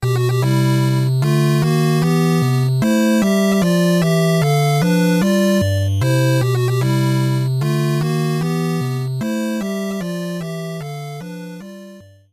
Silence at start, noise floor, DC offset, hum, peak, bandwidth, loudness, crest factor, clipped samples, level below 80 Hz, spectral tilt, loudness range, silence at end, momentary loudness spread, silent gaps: 0 s; -40 dBFS; under 0.1%; none; -6 dBFS; 15.5 kHz; -17 LUFS; 10 dB; under 0.1%; -50 dBFS; -6.5 dB/octave; 7 LU; 0.3 s; 12 LU; none